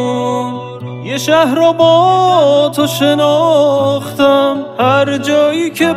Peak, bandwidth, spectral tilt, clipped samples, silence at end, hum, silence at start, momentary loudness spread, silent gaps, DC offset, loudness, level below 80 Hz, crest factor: 0 dBFS; 16 kHz; -5 dB/octave; under 0.1%; 0 s; none; 0 s; 10 LU; none; under 0.1%; -11 LUFS; -56 dBFS; 10 dB